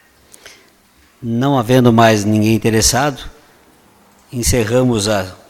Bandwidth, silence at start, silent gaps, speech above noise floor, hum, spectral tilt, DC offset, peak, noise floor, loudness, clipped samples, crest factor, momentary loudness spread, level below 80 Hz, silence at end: 16.5 kHz; 0.45 s; none; 38 dB; none; -4.5 dB/octave; under 0.1%; 0 dBFS; -51 dBFS; -14 LUFS; under 0.1%; 16 dB; 11 LU; -34 dBFS; 0.15 s